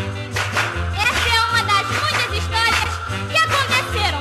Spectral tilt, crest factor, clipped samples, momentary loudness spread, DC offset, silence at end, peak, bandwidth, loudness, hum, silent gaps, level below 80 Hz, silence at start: -3 dB/octave; 14 dB; under 0.1%; 6 LU; under 0.1%; 0 s; -4 dBFS; 13.5 kHz; -18 LUFS; none; none; -34 dBFS; 0 s